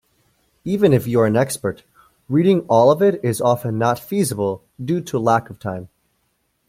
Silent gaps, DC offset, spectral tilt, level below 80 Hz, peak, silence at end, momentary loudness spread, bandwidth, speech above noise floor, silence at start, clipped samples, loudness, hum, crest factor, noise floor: none; under 0.1%; -6.5 dB/octave; -56 dBFS; -2 dBFS; 0.85 s; 15 LU; 16.5 kHz; 50 dB; 0.65 s; under 0.1%; -18 LUFS; none; 18 dB; -68 dBFS